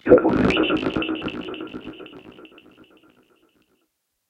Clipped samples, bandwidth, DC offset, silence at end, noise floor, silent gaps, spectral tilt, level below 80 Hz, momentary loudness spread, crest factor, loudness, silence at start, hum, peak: under 0.1%; 8.4 kHz; under 0.1%; 1.85 s; -73 dBFS; none; -7 dB/octave; -46 dBFS; 25 LU; 24 dB; -21 LUFS; 0.05 s; none; 0 dBFS